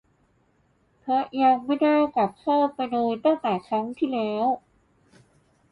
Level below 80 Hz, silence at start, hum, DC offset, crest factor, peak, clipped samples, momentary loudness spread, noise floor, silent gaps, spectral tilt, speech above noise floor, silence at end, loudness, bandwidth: -68 dBFS; 1.05 s; none; under 0.1%; 16 dB; -8 dBFS; under 0.1%; 6 LU; -65 dBFS; none; -7.5 dB/octave; 42 dB; 1.15 s; -24 LUFS; 5.2 kHz